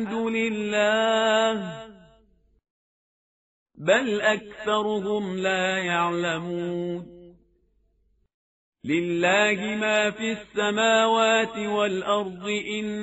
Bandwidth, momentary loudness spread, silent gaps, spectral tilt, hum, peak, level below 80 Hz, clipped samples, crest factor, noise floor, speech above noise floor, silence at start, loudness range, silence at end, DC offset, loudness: 8 kHz; 10 LU; 2.70-3.66 s, 8.34-8.72 s; -2.5 dB/octave; none; -6 dBFS; -64 dBFS; under 0.1%; 18 dB; -67 dBFS; 43 dB; 0 s; 6 LU; 0 s; under 0.1%; -24 LUFS